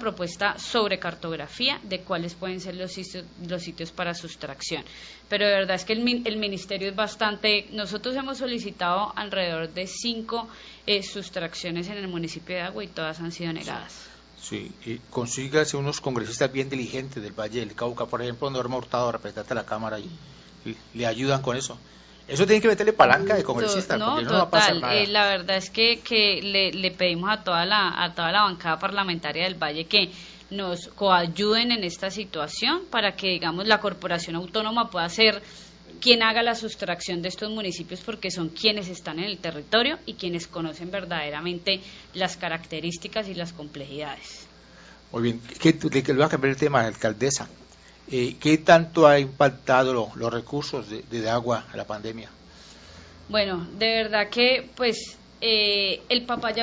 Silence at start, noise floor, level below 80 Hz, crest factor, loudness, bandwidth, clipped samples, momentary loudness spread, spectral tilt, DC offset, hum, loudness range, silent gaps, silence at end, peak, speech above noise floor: 0 s; -50 dBFS; -56 dBFS; 24 dB; -24 LUFS; 8 kHz; under 0.1%; 15 LU; -4 dB/octave; under 0.1%; none; 9 LU; none; 0 s; -2 dBFS; 24 dB